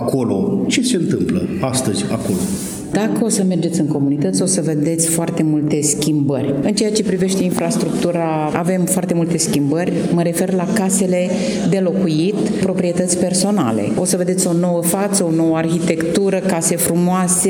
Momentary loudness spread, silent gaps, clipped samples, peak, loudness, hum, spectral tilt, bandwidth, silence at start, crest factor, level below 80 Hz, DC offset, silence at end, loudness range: 3 LU; none; under 0.1%; 0 dBFS; -17 LUFS; none; -5 dB/octave; over 20 kHz; 0 s; 16 dB; -52 dBFS; under 0.1%; 0 s; 2 LU